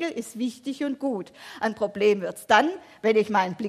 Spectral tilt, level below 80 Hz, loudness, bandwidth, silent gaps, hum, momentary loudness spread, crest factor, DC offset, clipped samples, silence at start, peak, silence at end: -4.5 dB/octave; -68 dBFS; -25 LUFS; 14.5 kHz; none; none; 10 LU; 20 dB; under 0.1%; under 0.1%; 0 s; -6 dBFS; 0 s